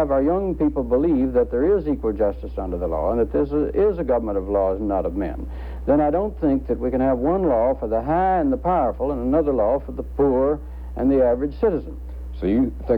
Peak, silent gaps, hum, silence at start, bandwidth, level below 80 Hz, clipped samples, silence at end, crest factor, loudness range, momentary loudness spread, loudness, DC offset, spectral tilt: -8 dBFS; none; none; 0 s; 5 kHz; -32 dBFS; under 0.1%; 0 s; 14 dB; 2 LU; 9 LU; -21 LUFS; under 0.1%; -10.5 dB/octave